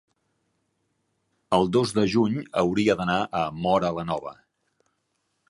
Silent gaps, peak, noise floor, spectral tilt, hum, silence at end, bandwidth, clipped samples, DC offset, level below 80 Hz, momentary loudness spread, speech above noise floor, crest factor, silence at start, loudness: none; -6 dBFS; -75 dBFS; -6 dB/octave; none; 1.15 s; 11.5 kHz; under 0.1%; under 0.1%; -56 dBFS; 8 LU; 51 dB; 20 dB; 1.5 s; -24 LUFS